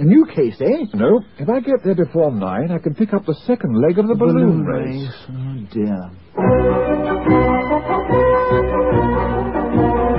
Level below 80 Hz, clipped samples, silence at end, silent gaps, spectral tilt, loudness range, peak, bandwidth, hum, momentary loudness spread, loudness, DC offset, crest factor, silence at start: -32 dBFS; under 0.1%; 0 s; none; -13.5 dB/octave; 2 LU; -2 dBFS; 5.6 kHz; none; 8 LU; -17 LUFS; 0.4%; 14 dB; 0 s